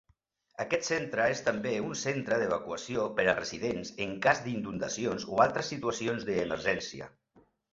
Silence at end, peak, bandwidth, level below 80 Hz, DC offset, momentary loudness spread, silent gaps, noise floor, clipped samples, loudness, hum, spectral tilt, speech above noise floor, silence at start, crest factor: 0.65 s; -8 dBFS; 8 kHz; -62 dBFS; under 0.1%; 8 LU; none; -71 dBFS; under 0.1%; -31 LUFS; none; -4 dB/octave; 40 dB; 0.6 s; 22 dB